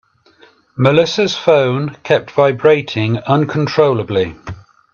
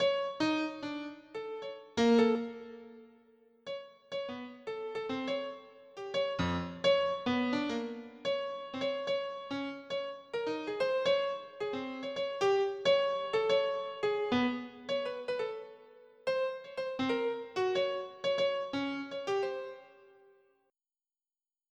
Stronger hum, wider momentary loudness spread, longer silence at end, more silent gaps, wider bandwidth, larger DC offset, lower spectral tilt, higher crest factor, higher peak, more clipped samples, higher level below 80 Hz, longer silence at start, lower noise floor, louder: neither; second, 9 LU vs 14 LU; second, 0.35 s vs 1.85 s; neither; second, 7.2 kHz vs 9.2 kHz; neither; first, -6.5 dB/octave vs -5 dB/octave; about the same, 14 dB vs 18 dB; first, 0 dBFS vs -16 dBFS; neither; first, -52 dBFS vs -68 dBFS; first, 0.75 s vs 0 s; second, -49 dBFS vs under -90 dBFS; first, -14 LUFS vs -34 LUFS